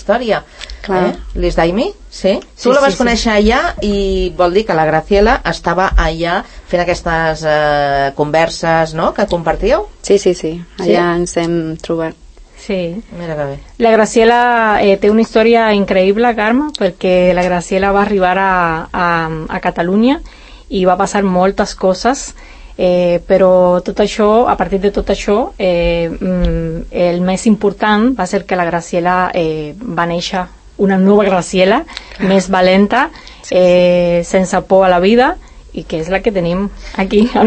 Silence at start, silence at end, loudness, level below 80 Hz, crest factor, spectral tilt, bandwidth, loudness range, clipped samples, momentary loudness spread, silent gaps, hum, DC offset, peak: 0 s; 0 s; -13 LUFS; -30 dBFS; 12 dB; -5.5 dB/octave; 8.8 kHz; 4 LU; under 0.1%; 10 LU; none; none; under 0.1%; 0 dBFS